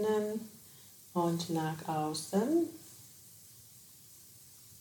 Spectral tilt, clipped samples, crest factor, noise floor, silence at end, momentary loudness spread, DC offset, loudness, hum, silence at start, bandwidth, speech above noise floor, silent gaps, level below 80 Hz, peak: -5.5 dB/octave; under 0.1%; 18 dB; -56 dBFS; 0 s; 21 LU; under 0.1%; -34 LUFS; none; 0 s; 19 kHz; 24 dB; none; -78 dBFS; -20 dBFS